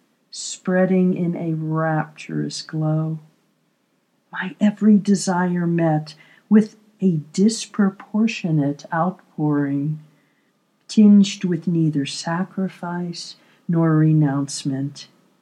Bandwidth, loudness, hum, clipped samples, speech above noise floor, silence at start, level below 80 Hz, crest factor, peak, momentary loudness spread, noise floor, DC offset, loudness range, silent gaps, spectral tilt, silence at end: 11 kHz; -20 LUFS; none; under 0.1%; 47 dB; 0.35 s; -82 dBFS; 18 dB; -2 dBFS; 13 LU; -66 dBFS; under 0.1%; 4 LU; none; -6.5 dB/octave; 0.35 s